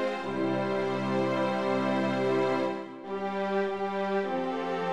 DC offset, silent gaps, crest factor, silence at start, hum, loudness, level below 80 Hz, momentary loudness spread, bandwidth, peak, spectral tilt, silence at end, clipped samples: 0.2%; none; 14 dB; 0 s; none; -29 LUFS; -70 dBFS; 5 LU; 10.5 kHz; -16 dBFS; -6.5 dB/octave; 0 s; under 0.1%